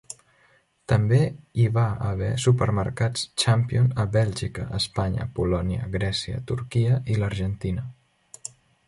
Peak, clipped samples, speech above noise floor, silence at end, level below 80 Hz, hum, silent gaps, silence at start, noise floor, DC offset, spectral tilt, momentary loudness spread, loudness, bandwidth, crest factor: -8 dBFS; under 0.1%; 38 dB; 0.95 s; -42 dBFS; none; none; 0.1 s; -62 dBFS; under 0.1%; -6 dB/octave; 12 LU; -24 LUFS; 11.5 kHz; 16 dB